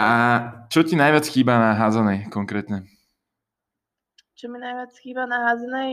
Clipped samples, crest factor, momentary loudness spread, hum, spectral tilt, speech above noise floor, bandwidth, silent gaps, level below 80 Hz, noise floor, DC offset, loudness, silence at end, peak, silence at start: under 0.1%; 18 dB; 16 LU; none; -6 dB/octave; 64 dB; 16 kHz; none; -66 dBFS; -85 dBFS; under 0.1%; -20 LUFS; 0 s; -4 dBFS; 0 s